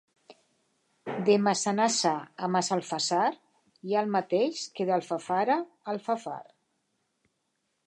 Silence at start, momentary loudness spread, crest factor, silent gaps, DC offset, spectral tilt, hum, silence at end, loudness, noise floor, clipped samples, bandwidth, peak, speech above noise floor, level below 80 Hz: 0.3 s; 12 LU; 20 dB; none; under 0.1%; -4 dB/octave; none; 1.45 s; -28 LUFS; -78 dBFS; under 0.1%; 11.5 kHz; -10 dBFS; 50 dB; -82 dBFS